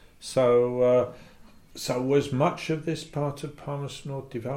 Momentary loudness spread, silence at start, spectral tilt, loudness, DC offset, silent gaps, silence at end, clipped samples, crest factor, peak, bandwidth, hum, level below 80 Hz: 13 LU; 0.2 s; -6 dB/octave; -26 LUFS; under 0.1%; none; 0 s; under 0.1%; 16 dB; -10 dBFS; 16 kHz; none; -56 dBFS